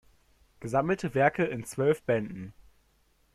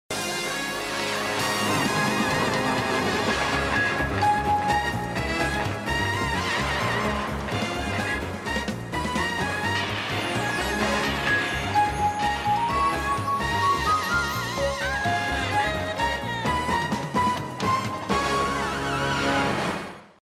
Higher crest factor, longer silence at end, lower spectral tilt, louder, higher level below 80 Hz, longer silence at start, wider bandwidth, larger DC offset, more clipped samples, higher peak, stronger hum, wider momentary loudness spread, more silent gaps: about the same, 20 dB vs 16 dB; first, 0.85 s vs 0.3 s; first, -6.5 dB/octave vs -4 dB/octave; second, -28 LUFS vs -25 LUFS; second, -60 dBFS vs -42 dBFS; first, 0.6 s vs 0.1 s; second, 13.5 kHz vs 16 kHz; neither; neither; about the same, -10 dBFS vs -10 dBFS; neither; first, 18 LU vs 5 LU; neither